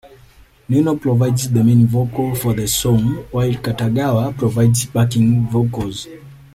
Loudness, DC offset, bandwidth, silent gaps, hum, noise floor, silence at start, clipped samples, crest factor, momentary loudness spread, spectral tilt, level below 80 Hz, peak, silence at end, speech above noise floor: -17 LUFS; under 0.1%; 15.5 kHz; none; none; -47 dBFS; 0.05 s; under 0.1%; 14 dB; 6 LU; -6.5 dB/octave; -42 dBFS; -2 dBFS; 0.2 s; 31 dB